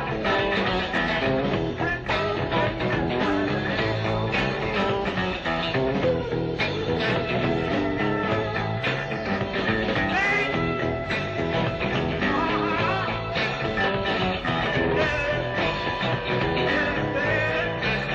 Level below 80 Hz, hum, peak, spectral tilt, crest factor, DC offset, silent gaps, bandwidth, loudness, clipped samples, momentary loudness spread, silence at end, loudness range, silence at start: -42 dBFS; none; -10 dBFS; -6.5 dB/octave; 14 dB; under 0.1%; none; 8.4 kHz; -24 LUFS; under 0.1%; 3 LU; 0 s; 1 LU; 0 s